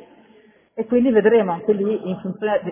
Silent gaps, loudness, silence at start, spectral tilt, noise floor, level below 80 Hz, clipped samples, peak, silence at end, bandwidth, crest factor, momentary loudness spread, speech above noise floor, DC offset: none; -19 LUFS; 0.75 s; -11 dB/octave; -53 dBFS; -58 dBFS; under 0.1%; -4 dBFS; 0 s; 3.6 kHz; 16 dB; 13 LU; 34 dB; under 0.1%